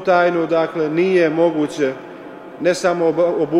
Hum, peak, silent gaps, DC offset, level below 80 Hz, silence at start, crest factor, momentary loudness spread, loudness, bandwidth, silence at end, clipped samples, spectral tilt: none; -2 dBFS; none; under 0.1%; -62 dBFS; 0 s; 14 dB; 16 LU; -17 LUFS; 11 kHz; 0 s; under 0.1%; -6 dB/octave